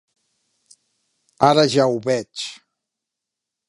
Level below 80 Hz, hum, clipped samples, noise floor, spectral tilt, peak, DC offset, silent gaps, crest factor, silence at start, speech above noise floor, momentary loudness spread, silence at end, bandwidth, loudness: -66 dBFS; none; under 0.1%; -84 dBFS; -5 dB/octave; 0 dBFS; under 0.1%; none; 22 dB; 1.4 s; 66 dB; 15 LU; 1.15 s; 11.5 kHz; -18 LUFS